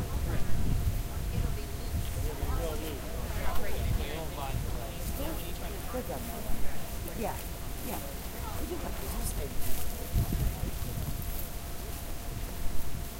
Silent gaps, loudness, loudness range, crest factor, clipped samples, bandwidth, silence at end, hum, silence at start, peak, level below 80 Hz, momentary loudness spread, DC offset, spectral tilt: none; -36 LUFS; 2 LU; 16 dB; under 0.1%; 16 kHz; 0 s; none; 0 s; -14 dBFS; -36 dBFS; 6 LU; 0.3%; -5 dB/octave